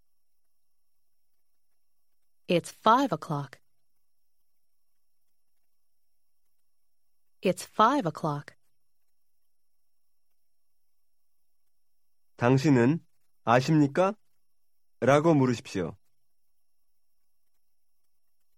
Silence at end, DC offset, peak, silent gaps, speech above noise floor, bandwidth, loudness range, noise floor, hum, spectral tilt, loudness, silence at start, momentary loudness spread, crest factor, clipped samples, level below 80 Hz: 2.65 s; under 0.1%; -6 dBFS; none; 59 dB; 16 kHz; 11 LU; -84 dBFS; none; -6.5 dB/octave; -26 LUFS; 2.5 s; 13 LU; 24 dB; under 0.1%; -68 dBFS